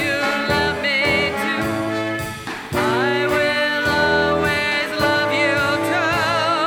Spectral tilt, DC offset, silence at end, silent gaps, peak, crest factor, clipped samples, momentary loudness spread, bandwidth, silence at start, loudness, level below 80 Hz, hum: -4 dB/octave; under 0.1%; 0 s; none; -4 dBFS; 14 dB; under 0.1%; 6 LU; 19.5 kHz; 0 s; -18 LUFS; -44 dBFS; none